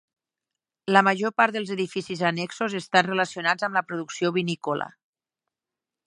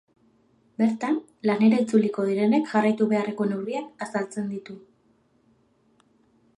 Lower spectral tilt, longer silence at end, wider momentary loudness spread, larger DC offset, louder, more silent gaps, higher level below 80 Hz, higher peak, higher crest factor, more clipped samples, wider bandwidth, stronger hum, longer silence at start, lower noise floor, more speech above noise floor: second, -4.5 dB/octave vs -7 dB/octave; second, 1.2 s vs 1.8 s; about the same, 10 LU vs 12 LU; neither; about the same, -24 LUFS vs -24 LUFS; neither; about the same, -74 dBFS vs -76 dBFS; first, -2 dBFS vs -8 dBFS; first, 24 dB vs 18 dB; neither; about the same, 11 kHz vs 10.5 kHz; neither; about the same, 0.85 s vs 0.8 s; first, -89 dBFS vs -64 dBFS; first, 64 dB vs 40 dB